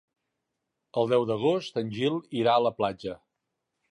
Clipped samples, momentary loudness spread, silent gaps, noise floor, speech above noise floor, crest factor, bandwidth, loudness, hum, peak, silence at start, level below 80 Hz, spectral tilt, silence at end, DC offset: under 0.1%; 12 LU; none; -83 dBFS; 56 dB; 18 dB; 10.5 kHz; -27 LUFS; none; -10 dBFS; 0.95 s; -68 dBFS; -6.5 dB/octave; 0.75 s; under 0.1%